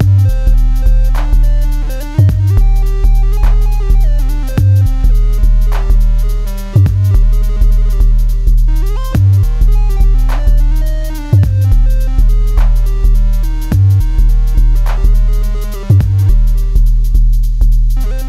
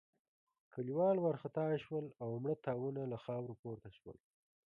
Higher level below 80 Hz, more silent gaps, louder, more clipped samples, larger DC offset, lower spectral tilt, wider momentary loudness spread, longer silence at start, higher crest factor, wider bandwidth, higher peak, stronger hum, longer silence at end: first, -10 dBFS vs -76 dBFS; second, none vs 3.59-3.63 s; first, -13 LUFS vs -40 LUFS; first, 0.1% vs under 0.1%; neither; second, -7.5 dB/octave vs -10 dB/octave; second, 6 LU vs 18 LU; second, 0 s vs 0.75 s; second, 8 dB vs 16 dB; first, 13 kHz vs 5 kHz; first, 0 dBFS vs -24 dBFS; neither; second, 0 s vs 0.55 s